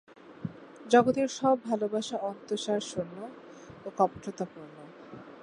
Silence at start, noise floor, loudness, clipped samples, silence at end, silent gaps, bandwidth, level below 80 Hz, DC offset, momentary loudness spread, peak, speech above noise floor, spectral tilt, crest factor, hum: 0.25 s; -48 dBFS; -29 LUFS; under 0.1%; 0 s; none; 11 kHz; -70 dBFS; under 0.1%; 24 LU; -8 dBFS; 19 dB; -5 dB/octave; 22 dB; none